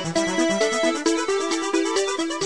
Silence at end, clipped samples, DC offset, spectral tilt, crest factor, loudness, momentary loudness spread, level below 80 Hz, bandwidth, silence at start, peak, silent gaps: 0 s; under 0.1%; 0.4%; -3 dB/octave; 14 dB; -22 LUFS; 2 LU; -60 dBFS; 10.5 kHz; 0 s; -8 dBFS; none